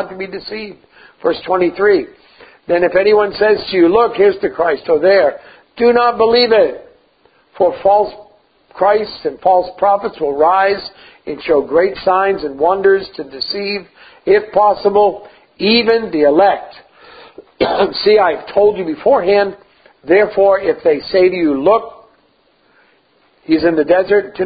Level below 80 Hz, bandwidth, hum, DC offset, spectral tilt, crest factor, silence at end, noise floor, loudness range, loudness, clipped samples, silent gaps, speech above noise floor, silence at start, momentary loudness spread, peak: -50 dBFS; 5 kHz; none; under 0.1%; -9 dB/octave; 14 dB; 0 s; -55 dBFS; 3 LU; -13 LUFS; under 0.1%; none; 42 dB; 0 s; 12 LU; 0 dBFS